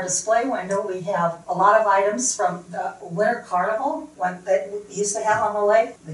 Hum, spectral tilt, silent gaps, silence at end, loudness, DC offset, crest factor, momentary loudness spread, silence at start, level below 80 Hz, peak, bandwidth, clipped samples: 60 Hz at -55 dBFS; -3.5 dB/octave; none; 0 s; -22 LUFS; under 0.1%; 18 dB; 10 LU; 0 s; -64 dBFS; -4 dBFS; 11.5 kHz; under 0.1%